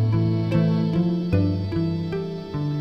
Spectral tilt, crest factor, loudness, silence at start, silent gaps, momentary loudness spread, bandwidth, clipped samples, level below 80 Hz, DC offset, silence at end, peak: -9.5 dB/octave; 14 dB; -23 LUFS; 0 s; none; 7 LU; 6 kHz; under 0.1%; -46 dBFS; 0.2%; 0 s; -8 dBFS